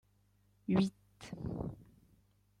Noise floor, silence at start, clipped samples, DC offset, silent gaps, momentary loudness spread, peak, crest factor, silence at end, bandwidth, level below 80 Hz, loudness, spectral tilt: -72 dBFS; 0.7 s; under 0.1%; under 0.1%; none; 20 LU; -18 dBFS; 22 dB; 0.75 s; 10.5 kHz; -60 dBFS; -38 LUFS; -7.5 dB/octave